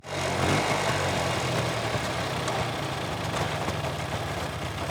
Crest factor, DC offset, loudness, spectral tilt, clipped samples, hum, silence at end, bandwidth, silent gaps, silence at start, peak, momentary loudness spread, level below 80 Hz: 16 dB; under 0.1%; -28 LUFS; -4.5 dB/octave; under 0.1%; none; 0 s; over 20 kHz; none; 0.05 s; -12 dBFS; 6 LU; -46 dBFS